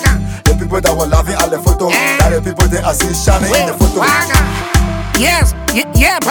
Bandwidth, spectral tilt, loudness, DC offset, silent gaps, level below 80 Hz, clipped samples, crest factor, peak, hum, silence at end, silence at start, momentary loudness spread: over 20 kHz; -4 dB/octave; -12 LUFS; under 0.1%; none; -16 dBFS; 0.3%; 12 dB; 0 dBFS; none; 0 s; 0 s; 4 LU